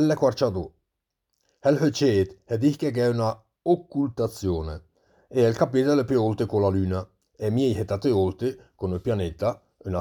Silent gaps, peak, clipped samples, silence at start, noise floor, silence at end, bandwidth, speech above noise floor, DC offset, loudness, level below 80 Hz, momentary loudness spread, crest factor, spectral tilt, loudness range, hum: none; -8 dBFS; under 0.1%; 0 s; -82 dBFS; 0 s; 19 kHz; 58 dB; under 0.1%; -25 LUFS; -50 dBFS; 10 LU; 18 dB; -7 dB/octave; 2 LU; none